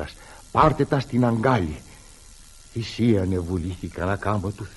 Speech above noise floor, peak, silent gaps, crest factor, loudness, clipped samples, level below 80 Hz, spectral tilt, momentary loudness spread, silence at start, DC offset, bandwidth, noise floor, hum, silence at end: 24 dB; -4 dBFS; none; 20 dB; -23 LUFS; under 0.1%; -42 dBFS; -7 dB/octave; 14 LU; 0 s; under 0.1%; 11.5 kHz; -47 dBFS; none; 0 s